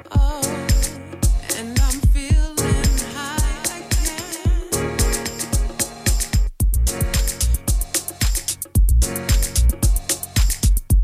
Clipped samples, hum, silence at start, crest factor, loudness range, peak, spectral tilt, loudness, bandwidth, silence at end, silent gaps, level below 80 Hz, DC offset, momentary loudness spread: under 0.1%; none; 0.05 s; 14 dB; 2 LU; -4 dBFS; -4 dB/octave; -21 LUFS; 15.5 kHz; 0 s; none; -20 dBFS; under 0.1%; 5 LU